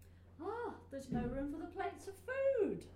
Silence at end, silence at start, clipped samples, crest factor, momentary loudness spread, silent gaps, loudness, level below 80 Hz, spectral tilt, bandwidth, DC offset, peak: 0 s; 0 s; under 0.1%; 18 dB; 12 LU; none; -41 LUFS; -58 dBFS; -7 dB/octave; 14 kHz; under 0.1%; -24 dBFS